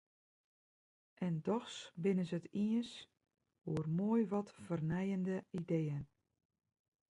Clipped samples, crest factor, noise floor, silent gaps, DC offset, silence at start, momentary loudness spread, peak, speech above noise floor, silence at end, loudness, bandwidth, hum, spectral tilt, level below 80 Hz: under 0.1%; 16 dB; under -90 dBFS; none; under 0.1%; 1.2 s; 12 LU; -24 dBFS; over 52 dB; 1.05 s; -39 LUFS; 11 kHz; none; -7.5 dB/octave; -72 dBFS